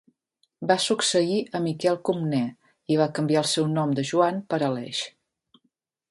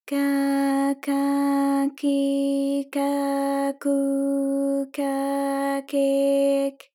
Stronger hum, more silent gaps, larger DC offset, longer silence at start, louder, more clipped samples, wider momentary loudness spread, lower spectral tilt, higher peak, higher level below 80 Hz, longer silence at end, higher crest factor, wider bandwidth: neither; neither; neither; first, 0.6 s vs 0.05 s; about the same, -24 LUFS vs -23 LUFS; neither; first, 9 LU vs 4 LU; about the same, -4.5 dB/octave vs -3.5 dB/octave; first, -6 dBFS vs -12 dBFS; first, -70 dBFS vs under -90 dBFS; first, 1 s vs 0.2 s; first, 20 dB vs 10 dB; second, 11.5 kHz vs 16.5 kHz